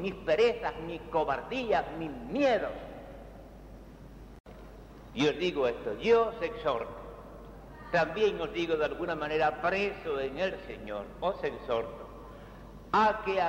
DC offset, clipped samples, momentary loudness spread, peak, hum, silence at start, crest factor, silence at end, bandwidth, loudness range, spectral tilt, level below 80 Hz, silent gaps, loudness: under 0.1%; under 0.1%; 24 LU; -14 dBFS; none; 0 s; 18 dB; 0 s; 15.5 kHz; 5 LU; -5.5 dB/octave; -52 dBFS; 4.40-4.44 s; -31 LUFS